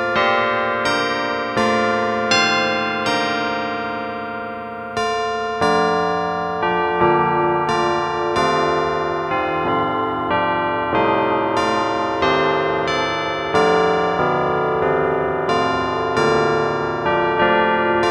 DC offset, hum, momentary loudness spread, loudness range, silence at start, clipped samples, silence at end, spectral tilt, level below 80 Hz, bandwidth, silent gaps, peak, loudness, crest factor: under 0.1%; none; 5 LU; 3 LU; 0 s; under 0.1%; 0 s; -4.5 dB/octave; -48 dBFS; 11.5 kHz; none; -2 dBFS; -18 LUFS; 16 dB